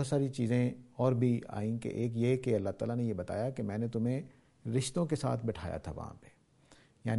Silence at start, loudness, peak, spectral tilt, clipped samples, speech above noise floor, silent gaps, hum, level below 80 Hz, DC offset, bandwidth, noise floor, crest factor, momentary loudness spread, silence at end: 0 s; -34 LUFS; -16 dBFS; -7 dB/octave; under 0.1%; 30 dB; none; none; -60 dBFS; under 0.1%; 11.5 kHz; -63 dBFS; 18 dB; 10 LU; 0 s